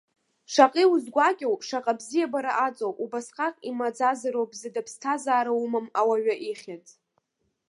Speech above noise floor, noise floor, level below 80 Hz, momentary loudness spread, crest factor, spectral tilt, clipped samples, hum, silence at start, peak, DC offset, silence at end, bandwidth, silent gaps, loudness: 50 dB; -75 dBFS; -84 dBFS; 12 LU; 24 dB; -3 dB/octave; under 0.1%; none; 0.5 s; -2 dBFS; under 0.1%; 0.9 s; 11.5 kHz; none; -26 LUFS